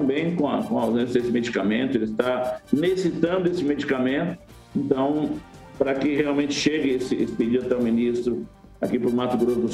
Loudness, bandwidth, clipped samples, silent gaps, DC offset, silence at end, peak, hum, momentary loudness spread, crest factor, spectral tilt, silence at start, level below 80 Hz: -24 LUFS; 13.5 kHz; under 0.1%; none; under 0.1%; 0 s; -4 dBFS; none; 6 LU; 18 dB; -6 dB/octave; 0 s; -54 dBFS